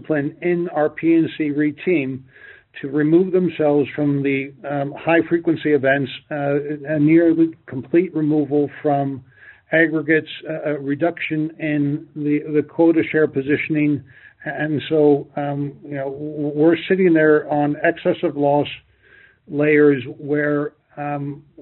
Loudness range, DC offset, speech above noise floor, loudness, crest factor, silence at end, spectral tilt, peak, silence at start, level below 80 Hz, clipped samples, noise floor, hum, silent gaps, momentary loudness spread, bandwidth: 2 LU; under 0.1%; 32 dB; -19 LUFS; 16 dB; 0 s; -6 dB/octave; -2 dBFS; 0 s; -62 dBFS; under 0.1%; -51 dBFS; none; none; 12 LU; 4.2 kHz